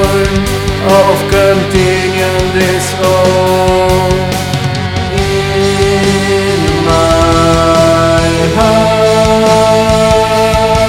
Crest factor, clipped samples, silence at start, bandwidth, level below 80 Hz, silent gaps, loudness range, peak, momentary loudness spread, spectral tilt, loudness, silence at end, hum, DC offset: 8 dB; 1%; 0 s; 18.5 kHz; -24 dBFS; none; 3 LU; 0 dBFS; 5 LU; -5 dB/octave; -9 LUFS; 0 s; none; under 0.1%